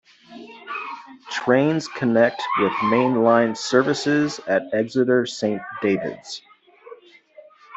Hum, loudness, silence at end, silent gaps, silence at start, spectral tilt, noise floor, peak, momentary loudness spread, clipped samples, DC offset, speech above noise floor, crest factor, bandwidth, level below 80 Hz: none; -21 LUFS; 0 s; none; 0.3 s; -5.5 dB/octave; -49 dBFS; -4 dBFS; 16 LU; under 0.1%; under 0.1%; 28 dB; 18 dB; 8.2 kHz; -66 dBFS